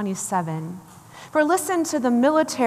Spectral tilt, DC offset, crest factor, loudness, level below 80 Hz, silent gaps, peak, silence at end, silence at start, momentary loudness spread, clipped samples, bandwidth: -4.5 dB/octave; under 0.1%; 14 dB; -22 LUFS; -70 dBFS; none; -8 dBFS; 0 s; 0 s; 17 LU; under 0.1%; 15 kHz